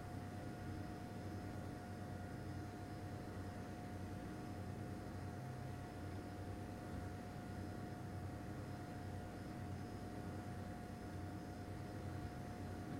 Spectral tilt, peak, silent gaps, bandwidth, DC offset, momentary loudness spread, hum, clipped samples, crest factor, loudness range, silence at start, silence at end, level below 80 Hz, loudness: -7 dB/octave; -36 dBFS; none; 16 kHz; under 0.1%; 1 LU; none; under 0.1%; 12 dB; 0 LU; 0 s; 0 s; -62 dBFS; -50 LUFS